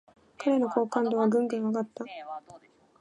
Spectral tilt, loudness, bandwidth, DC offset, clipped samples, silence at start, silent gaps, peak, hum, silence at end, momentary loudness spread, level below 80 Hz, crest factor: -7 dB/octave; -28 LUFS; 10.5 kHz; under 0.1%; under 0.1%; 0.4 s; none; -10 dBFS; none; 0.45 s; 15 LU; -80 dBFS; 20 dB